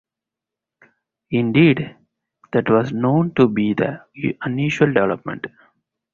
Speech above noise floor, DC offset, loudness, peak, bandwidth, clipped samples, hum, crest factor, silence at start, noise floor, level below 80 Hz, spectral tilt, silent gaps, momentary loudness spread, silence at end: 68 dB; under 0.1%; -19 LUFS; -2 dBFS; 7.4 kHz; under 0.1%; none; 18 dB; 1.3 s; -86 dBFS; -56 dBFS; -8 dB/octave; none; 12 LU; 0.65 s